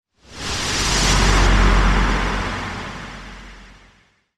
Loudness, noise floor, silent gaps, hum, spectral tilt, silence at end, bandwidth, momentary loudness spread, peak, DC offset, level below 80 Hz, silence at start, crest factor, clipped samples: -18 LUFS; -56 dBFS; none; none; -3.5 dB/octave; 0.7 s; 12.5 kHz; 19 LU; -2 dBFS; under 0.1%; -22 dBFS; 0.3 s; 16 dB; under 0.1%